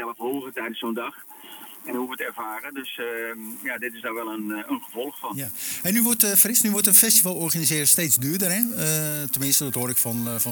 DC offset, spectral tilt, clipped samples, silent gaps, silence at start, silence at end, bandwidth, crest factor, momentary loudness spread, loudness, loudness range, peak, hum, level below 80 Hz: under 0.1%; -2.5 dB/octave; under 0.1%; none; 0 s; 0 s; 19.5 kHz; 24 dB; 17 LU; -21 LUFS; 14 LU; 0 dBFS; none; -68 dBFS